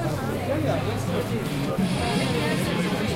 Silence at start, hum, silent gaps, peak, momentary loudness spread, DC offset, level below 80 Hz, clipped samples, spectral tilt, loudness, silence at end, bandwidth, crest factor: 0 s; none; none; -12 dBFS; 3 LU; under 0.1%; -44 dBFS; under 0.1%; -5.5 dB/octave; -25 LUFS; 0 s; 16 kHz; 12 dB